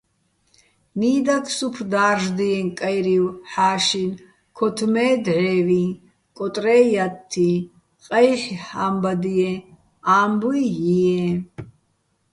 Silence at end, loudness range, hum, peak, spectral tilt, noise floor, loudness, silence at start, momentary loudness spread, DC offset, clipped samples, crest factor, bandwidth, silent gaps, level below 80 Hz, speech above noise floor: 0.65 s; 1 LU; none; -4 dBFS; -5.5 dB/octave; -67 dBFS; -20 LUFS; 0.95 s; 11 LU; under 0.1%; under 0.1%; 18 dB; 11.5 kHz; none; -60 dBFS; 48 dB